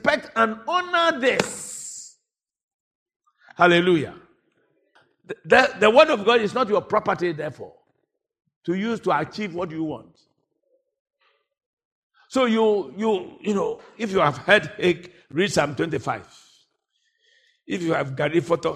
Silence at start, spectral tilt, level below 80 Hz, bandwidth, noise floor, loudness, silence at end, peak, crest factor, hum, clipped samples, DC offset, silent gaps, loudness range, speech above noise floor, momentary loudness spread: 0.05 s; -4.5 dB/octave; -62 dBFS; 14 kHz; -74 dBFS; -22 LUFS; 0 s; -2 dBFS; 22 dB; none; under 0.1%; under 0.1%; 2.64-2.68 s, 2.74-3.06 s, 3.16-3.20 s, 8.56-8.61 s, 11.00-11.05 s, 11.66-11.77 s, 11.85-12.10 s; 9 LU; 53 dB; 15 LU